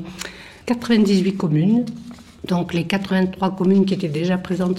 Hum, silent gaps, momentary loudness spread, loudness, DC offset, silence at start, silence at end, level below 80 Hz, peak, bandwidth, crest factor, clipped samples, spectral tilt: none; none; 16 LU; -19 LUFS; under 0.1%; 0 s; 0 s; -52 dBFS; -6 dBFS; 12.5 kHz; 14 dB; under 0.1%; -7 dB/octave